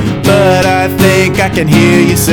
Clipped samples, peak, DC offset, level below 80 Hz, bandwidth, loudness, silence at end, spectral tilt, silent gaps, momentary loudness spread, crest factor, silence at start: under 0.1%; 0 dBFS; under 0.1%; -30 dBFS; 17.5 kHz; -8 LUFS; 0 s; -5 dB/octave; none; 3 LU; 8 dB; 0 s